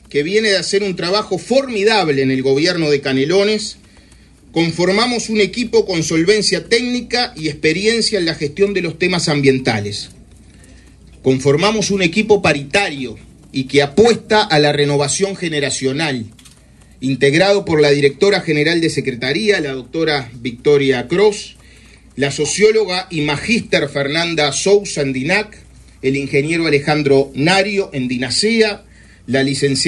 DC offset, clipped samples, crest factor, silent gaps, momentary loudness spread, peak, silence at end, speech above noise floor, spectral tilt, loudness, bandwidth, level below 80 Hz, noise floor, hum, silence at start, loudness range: under 0.1%; under 0.1%; 16 dB; none; 7 LU; 0 dBFS; 0 s; 30 dB; -4 dB/octave; -15 LUFS; 11.5 kHz; -46 dBFS; -45 dBFS; none; 0.1 s; 2 LU